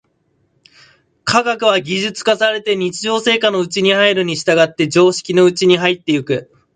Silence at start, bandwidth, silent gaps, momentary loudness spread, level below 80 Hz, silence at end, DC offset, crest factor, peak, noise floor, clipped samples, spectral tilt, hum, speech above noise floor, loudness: 1.25 s; 9.4 kHz; none; 6 LU; -58 dBFS; 0.3 s; under 0.1%; 16 dB; 0 dBFS; -62 dBFS; under 0.1%; -4 dB/octave; none; 48 dB; -14 LUFS